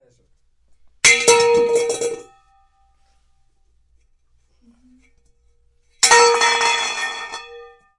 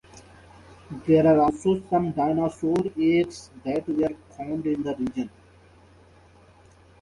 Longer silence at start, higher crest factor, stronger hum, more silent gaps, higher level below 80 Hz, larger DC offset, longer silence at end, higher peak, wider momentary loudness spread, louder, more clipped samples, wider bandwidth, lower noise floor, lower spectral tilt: first, 1.05 s vs 0.15 s; about the same, 20 dB vs 18 dB; neither; neither; about the same, -56 dBFS vs -54 dBFS; neither; second, 0.35 s vs 1.75 s; first, 0 dBFS vs -8 dBFS; first, 18 LU vs 15 LU; first, -15 LUFS vs -24 LUFS; neither; about the same, 11.5 kHz vs 11 kHz; first, -59 dBFS vs -54 dBFS; second, 0.5 dB/octave vs -7.5 dB/octave